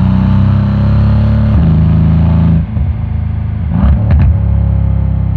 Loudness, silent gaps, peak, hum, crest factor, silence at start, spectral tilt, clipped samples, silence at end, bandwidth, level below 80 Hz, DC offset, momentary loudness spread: -11 LUFS; none; 0 dBFS; none; 8 dB; 0 s; -11 dB/octave; under 0.1%; 0 s; 4.6 kHz; -16 dBFS; under 0.1%; 6 LU